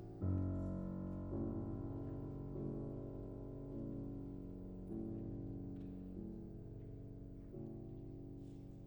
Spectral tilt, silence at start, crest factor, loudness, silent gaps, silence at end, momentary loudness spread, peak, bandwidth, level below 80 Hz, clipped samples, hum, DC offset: -11.5 dB/octave; 0 s; 18 dB; -47 LUFS; none; 0 s; 10 LU; -28 dBFS; 19.5 kHz; -56 dBFS; under 0.1%; none; under 0.1%